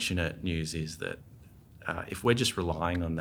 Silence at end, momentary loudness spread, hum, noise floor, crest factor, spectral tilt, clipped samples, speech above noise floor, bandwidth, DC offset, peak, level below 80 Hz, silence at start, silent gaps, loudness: 0 s; 12 LU; none; -53 dBFS; 22 dB; -4.5 dB/octave; under 0.1%; 22 dB; 20 kHz; under 0.1%; -10 dBFS; -48 dBFS; 0 s; none; -32 LUFS